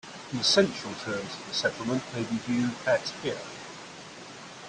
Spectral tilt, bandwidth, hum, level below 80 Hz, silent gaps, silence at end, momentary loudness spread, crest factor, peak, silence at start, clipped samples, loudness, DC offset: -3.5 dB/octave; 10.5 kHz; none; -66 dBFS; none; 0 s; 20 LU; 22 dB; -8 dBFS; 0.05 s; under 0.1%; -28 LUFS; under 0.1%